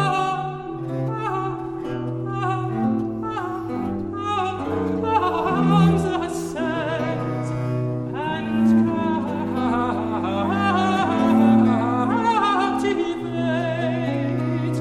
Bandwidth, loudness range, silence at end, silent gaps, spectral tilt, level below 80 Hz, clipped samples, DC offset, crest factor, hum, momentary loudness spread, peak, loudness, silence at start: 12.5 kHz; 6 LU; 0 s; none; -7 dB/octave; -50 dBFS; under 0.1%; under 0.1%; 16 dB; none; 10 LU; -6 dBFS; -22 LUFS; 0 s